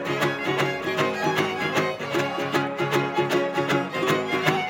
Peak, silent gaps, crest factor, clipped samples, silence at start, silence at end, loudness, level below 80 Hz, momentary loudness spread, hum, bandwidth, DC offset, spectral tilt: -4 dBFS; none; 20 dB; under 0.1%; 0 s; 0 s; -24 LUFS; -66 dBFS; 2 LU; none; 17 kHz; under 0.1%; -5 dB/octave